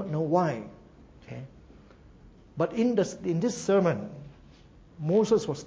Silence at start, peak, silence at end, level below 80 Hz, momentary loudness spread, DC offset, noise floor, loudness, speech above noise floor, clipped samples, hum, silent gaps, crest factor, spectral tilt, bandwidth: 0 s; -10 dBFS; 0 s; -58 dBFS; 21 LU; under 0.1%; -53 dBFS; -27 LUFS; 27 dB; under 0.1%; none; none; 18 dB; -6.5 dB/octave; 8 kHz